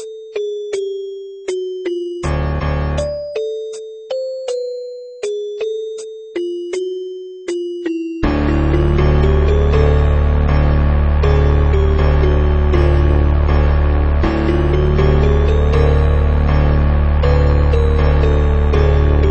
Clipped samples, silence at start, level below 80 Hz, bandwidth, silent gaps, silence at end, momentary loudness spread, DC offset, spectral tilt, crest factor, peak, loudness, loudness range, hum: under 0.1%; 0 s; -16 dBFS; 8.4 kHz; none; 0 s; 11 LU; under 0.1%; -8 dB/octave; 14 dB; 0 dBFS; -16 LUFS; 9 LU; none